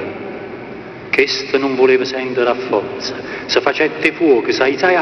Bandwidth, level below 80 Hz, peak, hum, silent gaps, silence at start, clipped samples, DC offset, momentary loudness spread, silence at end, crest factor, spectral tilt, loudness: 6.6 kHz; -54 dBFS; 0 dBFS; none; none; 0 s; under 0.1%; under 0.1%; 15 LU; 0 s; 16 dB; -4 dB/octave; -16 LUFS